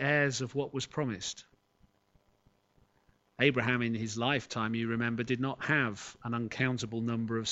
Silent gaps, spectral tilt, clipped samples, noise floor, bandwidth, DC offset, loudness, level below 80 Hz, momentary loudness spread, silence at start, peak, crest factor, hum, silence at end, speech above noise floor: none; -5 dB/octave; under 0.1%; -70 dBFS; 8.2 kHz; under 0.1%; -32 LUFS; -66 dBFS; 8 LU; 0 s; -10 dBFS; 24 dB; none; 0 s; 38 dB